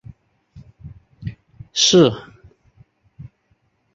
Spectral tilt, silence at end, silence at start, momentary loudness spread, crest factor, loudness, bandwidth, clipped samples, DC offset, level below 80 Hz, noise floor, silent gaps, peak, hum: -4 dB/octave; 0.7 s; 0.55 s; 22 LU; 20 dB; -15 LUFS; 7.8 kHz; under 0.1%; under 0.1%; -52 dBFS; -64 dBFS; none; -2 dBFS; none